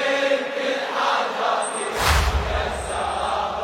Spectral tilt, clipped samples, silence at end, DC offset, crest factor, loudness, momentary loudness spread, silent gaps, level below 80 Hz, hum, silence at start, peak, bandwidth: -3.5 dB/octave; under 0.1%; 0 s; under 0.1%; 20 dB; -22 LUFS; 5 LU; none; -30 dBFS; none; 0 s; -4 dBFS; 16.5 kHz